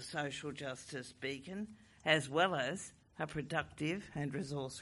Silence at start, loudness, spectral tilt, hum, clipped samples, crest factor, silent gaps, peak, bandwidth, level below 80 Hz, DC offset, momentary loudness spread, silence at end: 0 s; -39 LUFS; -4.5 dB/octave; none; under 0.1%; 24 dB; none; -14 dBFS; 11.5 kHz; -68 dBFS; under 0.1%; 13 LU; 0 s